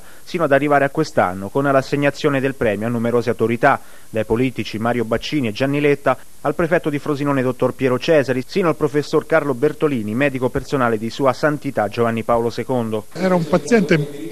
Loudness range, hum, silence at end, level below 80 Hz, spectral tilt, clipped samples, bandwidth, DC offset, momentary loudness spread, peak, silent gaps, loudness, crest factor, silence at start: 1 LU; none; 0 s; -48 dBFS; -6.5 dB/octave; under 0.1%; 14 kHz; 2%; 6 LU; 0 dBFS; none; -19 LUFS; 18 dB; 0.25 s